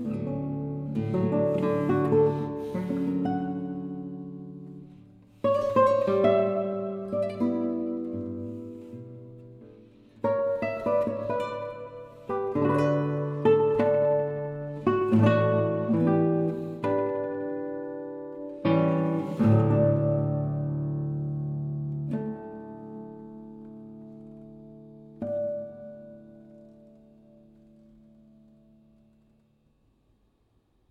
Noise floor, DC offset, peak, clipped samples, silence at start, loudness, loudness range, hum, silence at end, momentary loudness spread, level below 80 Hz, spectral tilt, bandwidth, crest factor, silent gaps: -68 dBFS; under 0.1%; -8 dBFS; under 0.1%; 0 s; -27 LUFS; 14 LU; none; 4.2 s; 21 LU; -60 dBFS; -9.5 dB/octave; 7.6 kHz; 20 dB; none